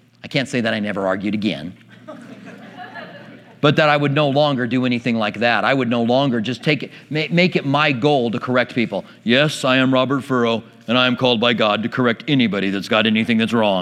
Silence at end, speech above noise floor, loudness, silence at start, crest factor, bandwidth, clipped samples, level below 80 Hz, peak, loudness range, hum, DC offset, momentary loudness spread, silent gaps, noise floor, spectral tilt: 0 s; 23 dB; -18 LUFS; 0.25 s; 18 dB; 12.5 kHz; under 0.1%; -66 dBFS; 0 dBFS; 4 LU; none; under 0.1%; 14 LU; none; -40 dBFS; -6 dB/octave